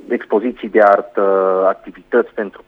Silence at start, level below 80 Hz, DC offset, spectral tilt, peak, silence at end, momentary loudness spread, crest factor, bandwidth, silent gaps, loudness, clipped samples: 0.1 s; -58 dBFS; under 0.1%; -8 dB/octave; 0 dBFS; 0.1 s; 7 LU; 16 dB; 5.4 kHz; none; -15 LUFS; under 0.1%